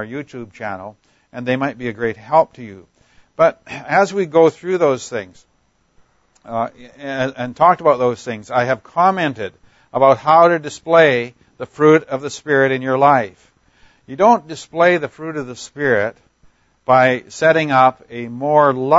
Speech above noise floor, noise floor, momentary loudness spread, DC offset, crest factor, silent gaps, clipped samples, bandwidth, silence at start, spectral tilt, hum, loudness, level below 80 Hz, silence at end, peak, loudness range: 46 dB; -62 dBFS; 17 LU; under 0.1%; 16 dB; none; under 0.1%; 8 kHz; 0 s; -5.5 dB/octave; none; -16 LUFS; -60 dBFS; 0 s; 0 dBFS; 6 LU